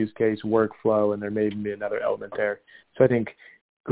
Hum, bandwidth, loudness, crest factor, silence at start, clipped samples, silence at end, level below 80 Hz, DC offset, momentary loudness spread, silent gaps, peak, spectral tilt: none; 4 kHz; -25 LUFS; 20 dB; 0 s; under 0.1%; 0 s; -60 dBFS; under 0.1%; 9 LU; 3.61-3.84 s; -4 dBFS; -11.5 dB/octave